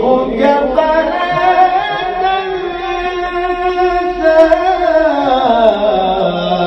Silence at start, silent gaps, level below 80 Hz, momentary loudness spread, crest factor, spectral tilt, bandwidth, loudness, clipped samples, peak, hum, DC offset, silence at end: 0 s; none; -36 dBFS; 7 LU; 12 dB; -6 dB/octave; 7.2 kHz; -12 LUFS; 0.2%; 0 dBFS; none; under 0.1%; 0 s